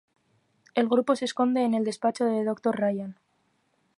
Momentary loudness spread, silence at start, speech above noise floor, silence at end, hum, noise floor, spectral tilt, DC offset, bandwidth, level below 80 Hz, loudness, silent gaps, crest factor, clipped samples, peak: 6 LU; 0.75 s; 45 dB; 0.85 s; none; -71 dBFS; -5.5 dB/octave; under 0.1%; 11.5 kHz; -78 dBFS; -26 LUFS; none; 18 dB; under 0.1%; -10 dBFS